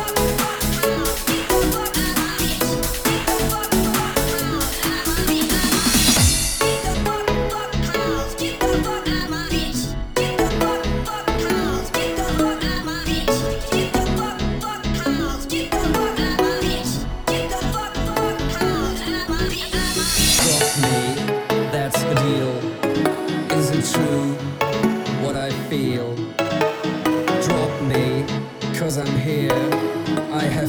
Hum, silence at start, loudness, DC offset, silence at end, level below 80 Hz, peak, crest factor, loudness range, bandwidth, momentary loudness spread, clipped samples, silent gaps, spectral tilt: none; 0 s; -20 LUFS; under 0.1%; 0 s; -32 dBFS; -2 dBFS; 18 dB; 4 LU; over 20 kHz; 6 LU; under 0.1%; none; -4 dB/octave